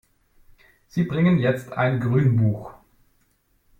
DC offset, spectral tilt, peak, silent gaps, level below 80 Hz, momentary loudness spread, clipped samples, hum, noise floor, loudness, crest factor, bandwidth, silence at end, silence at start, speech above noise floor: under 0.1%; -9 dB/octave; -8 dBFS; none; -54 dBFS; 12 LU; under 0.1%; none; -65 dBFS; -22 LUFS; 16 dB; 8.8 kHz; 1.1 s; 0.95 s; 45 dB